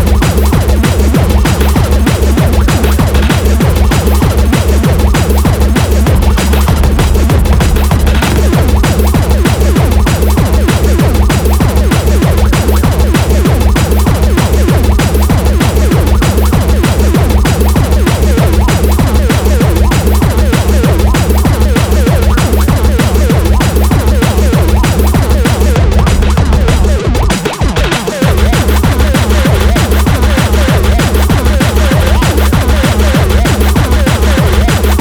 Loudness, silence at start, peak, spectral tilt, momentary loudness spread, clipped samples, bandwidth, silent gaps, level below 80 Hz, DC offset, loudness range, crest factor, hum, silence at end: -9 LUFS; 0 s; 0 dBFS; -6 dB/octave; 1 LU; 0.2%; over 20 kHz; none; -10 dBFS; 0.5%; 0 LU; 8 dB; none; 0 s